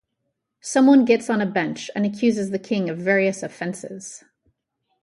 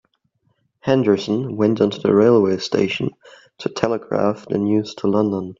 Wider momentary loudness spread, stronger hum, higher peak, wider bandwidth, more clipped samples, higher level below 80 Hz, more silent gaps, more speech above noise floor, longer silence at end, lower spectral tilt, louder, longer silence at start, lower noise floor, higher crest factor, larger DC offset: first, 18 LU vs 9 LU; neither; second, -6 dBFS vs 0 dBFS; first, 11.5 kHz vs 7.6 kHz; neither; second, -68 dBFS vs -58 dBFS; neither; first, 56 dB vs 48 dB; first, 0.85 s vs 0.05 s; second, -5.5 dB/octave vs -7 dB/octave; about the same, -21 LUFS vs -19 LUFS; second, 0.65 s vs 0.85 s; first, -77 dBFS vs -66 dBFS; about the same, 16 dB vs 18 dB; neither